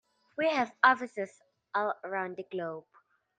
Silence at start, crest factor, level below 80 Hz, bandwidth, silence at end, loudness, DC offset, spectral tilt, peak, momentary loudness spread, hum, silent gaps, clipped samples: 0.4 s; 24 dB; -82 dBFS; 9.4 kHz; 0.6 s; -31 LUFS; under 0.1%; -4.5 dB/octave; -8 dBFS; 16 LU; none; none; under 0.1%